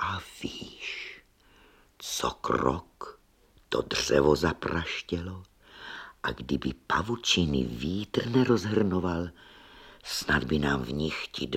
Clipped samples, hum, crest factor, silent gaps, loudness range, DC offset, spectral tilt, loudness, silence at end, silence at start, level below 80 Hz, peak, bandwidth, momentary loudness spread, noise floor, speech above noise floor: under 0.1%; none; 22 dB; none; 6 LU; under 0.1%; -4.5 dB/octave; -29 LUFS; 0 s; 0 s; -48 dBFS; -8 dBFS; 16.5 kHz; 17 LU; -62 dBFS; 34 dB